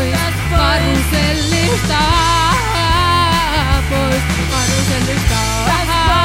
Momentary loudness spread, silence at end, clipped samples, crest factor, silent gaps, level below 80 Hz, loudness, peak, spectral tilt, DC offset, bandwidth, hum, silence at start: 3 LU; 0 s; under 0.1%; 12 dB; none; -22 dBFS; -14 LUFS; 0 dBFS; -4 dB/octave; 0.2%; 16 kHz; none; 0 s